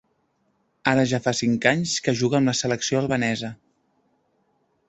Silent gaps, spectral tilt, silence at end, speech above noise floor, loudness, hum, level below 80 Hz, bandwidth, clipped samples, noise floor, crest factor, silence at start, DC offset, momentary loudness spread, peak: none; -4.5 dB/octave; 1.35 s; 47 dB; -22 LUFS; none; -58 dBFS; 8.2 kHz; under 0.1%; -69 dBFS; 22 dB; 0.85 s; under 0.1%; 5 LU; -2 dBFS